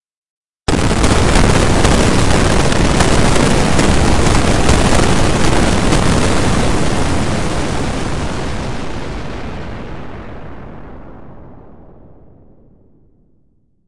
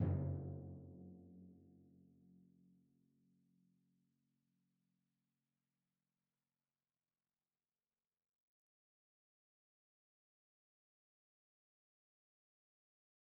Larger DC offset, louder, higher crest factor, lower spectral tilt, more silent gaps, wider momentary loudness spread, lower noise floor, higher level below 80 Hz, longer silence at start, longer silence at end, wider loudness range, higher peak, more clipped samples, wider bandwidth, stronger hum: first, 8% vs under 0.1%; first, -14 LUFS vs -47 LUFS; second, 14 dB vs 26 dB; second, -5 dB/octave vs -10.5 dB/octave; first, 0.17-0.50 s vs none; second, 17 LU vs 26 LU; second, -58 dBFS vs under -90 dBFS; first, -22 dBFS vs -74 dBFS; about the same, 0 s vs 0 s; second, 0 s vs 11.4 s; about the same, 17 LU vs 19 LU; first, 0 dBFS vs -28 dBFS; neither; first, 11.5 kHz vs 1.6 kHz; neither